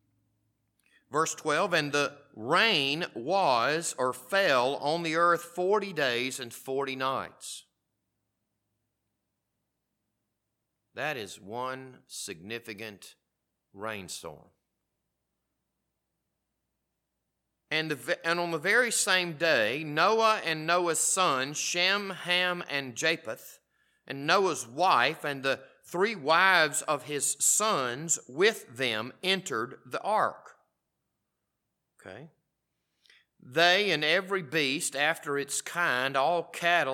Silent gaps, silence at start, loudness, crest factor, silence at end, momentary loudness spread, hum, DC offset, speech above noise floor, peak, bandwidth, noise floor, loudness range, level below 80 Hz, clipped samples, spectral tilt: none; 1.1 s; -27 LUFS; 22 dB; 0 s; 15 LU; none; under 0.1%; 54 dB; -8 dBFS; 17.5 kHz; -83 dBFS; 15 LU; -82 dBFS; under 0.1%; -2 dB/octave